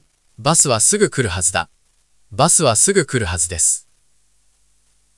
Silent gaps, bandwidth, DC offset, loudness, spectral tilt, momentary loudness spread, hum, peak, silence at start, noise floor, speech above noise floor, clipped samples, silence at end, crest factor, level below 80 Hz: none; 12 kHz; under 0.1%; -15 LUFS; -3 dB/octave; 11 LU; 50 Hz at -45 dBFS; 0 dBFS; 0.4 s; -62 dBFS; 46 dB; under 0.1%; 1.35 s; 18 dB; -48 dBFS